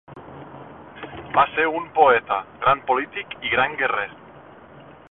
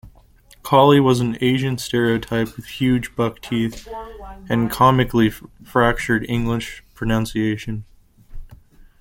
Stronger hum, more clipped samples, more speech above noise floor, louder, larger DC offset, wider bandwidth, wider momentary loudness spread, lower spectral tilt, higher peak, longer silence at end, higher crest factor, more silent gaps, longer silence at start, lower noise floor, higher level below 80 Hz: neither; neither; second, 24 dB vs 31 dB; about the same, -21 LUFS vs -19 LUFS; neither; second, 4.1 kHz vs 17 kHz; first, 24 LU vs 18 LU; first, -8 dB/octave vs -6 dB/octave; about the same, -2 dBFS vs -2 dBFS; second, 0.2 s vs 0.45 s; about the same, 20 dB vs 18 dB; neither; about the same, 0.1 s vs 0.05 s; second, -45 dBFS vs -50 dBFS; second, -56 dBFS vs -40 dBFS